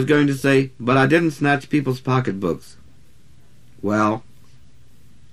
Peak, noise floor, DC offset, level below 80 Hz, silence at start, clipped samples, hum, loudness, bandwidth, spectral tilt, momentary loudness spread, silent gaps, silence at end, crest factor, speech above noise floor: -2 dBFS; -52 dBFS; 0.7%; -54 dBFS; 0 s; under 0.1%; none; -19 LUFS; 13.5 kHz; -6.5 dB/octave; 9 LU; none; 1.1 s; 18 dB; 34 dB